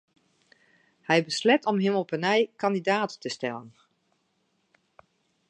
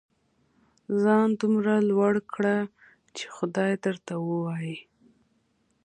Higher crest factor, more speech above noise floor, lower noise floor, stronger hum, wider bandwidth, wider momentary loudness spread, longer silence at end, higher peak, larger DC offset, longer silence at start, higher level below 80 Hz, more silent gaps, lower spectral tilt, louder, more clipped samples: about the same, 22 dB vs 18 dB; about the same, 47 dB vs 45 dB; about the same, -73 dBFS vs -70 dBFS; neither; first, 11 kHz vs 9.6 kHz; second, 10 LU vs 15 LU; first, 1.8 s vs 1.05 s; about the same, -8 dBFS vs -10 dBFS; neither; first, 1.1 s vs 0.9 s; second, -80 dBFS vs -72 dBFS; neither; second, -5 dB/octave vs -7 dB/octave; about the same, -26 LUFS vs -26 LUFS; neither